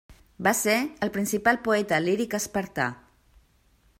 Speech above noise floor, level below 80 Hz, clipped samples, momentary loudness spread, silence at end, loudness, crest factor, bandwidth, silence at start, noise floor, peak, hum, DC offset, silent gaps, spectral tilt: 37 dB; -58 dBFS; under 0.1%; 7 LU; 1.05 s; -25 LUFS; 20 dB; 16 kHz; 0.1 s; -63 dBFS; -6 dBFS; none; under 0.1%; none; -4 dB/octave